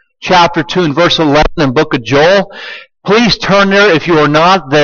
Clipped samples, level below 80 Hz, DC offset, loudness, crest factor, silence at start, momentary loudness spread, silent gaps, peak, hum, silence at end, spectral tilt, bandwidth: under 0.1%; -30 dBFS; under 0.1%; -9 LUFS; 10 dB; 0.2 s; 5 LU; none; 0 dBFS; none; 0 s; -5 dB/octave; 7.2 kHz